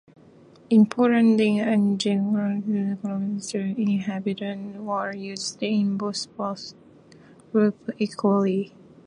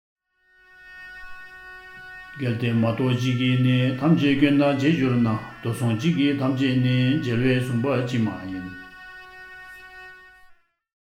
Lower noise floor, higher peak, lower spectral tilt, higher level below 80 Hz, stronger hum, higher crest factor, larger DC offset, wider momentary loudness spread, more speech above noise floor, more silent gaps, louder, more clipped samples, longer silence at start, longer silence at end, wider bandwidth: second, -51 dBFS vs -60 dBFS; about the same, -8 dBFS vs -6 dBFS; second, -6 dB/octave vs -7.5 dB/octave; second, -70 dBFS vs -54 dBFS; neither; about the same, 16 dB vs 18 dB; neither; second, 12 LU vs 21 LU; second, 28 dB vs 39 dB; neither; about the same, -24 LUFS vs -22 LUFS; neither; second, 0.7 s vs 0.85 s; second, 0.4 s vs 0.9 s; second, 10.5 kHz vs 14.5 kHz